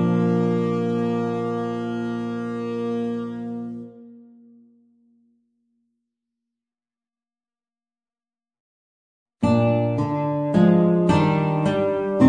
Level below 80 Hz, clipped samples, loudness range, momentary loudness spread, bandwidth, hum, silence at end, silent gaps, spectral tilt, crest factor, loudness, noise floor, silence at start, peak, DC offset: -56 dBFS; under 0.1%; 15 LU; 12 LU; 9.6 kHz; none; 0 s; 8.60-9.26 s; -8.5 dB/octave; 20 dB; -22 LUFS; under -90 dBFS; 0 s; -4 dBFS; under 0.1%